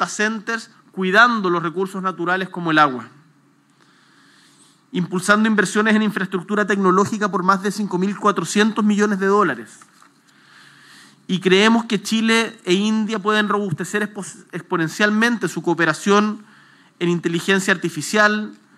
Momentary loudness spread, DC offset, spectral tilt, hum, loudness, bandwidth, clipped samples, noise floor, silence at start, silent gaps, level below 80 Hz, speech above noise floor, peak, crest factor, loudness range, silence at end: 10 LU; under 0.1%; -4.5 dB/octave; none; -18 LUFS; 14 kHz; under 0.1%; -56 dBFS; 0 s; none; -80 dBFS; 38 dB; 0 dBFS; 20 dB; 3 LU; 0.25 s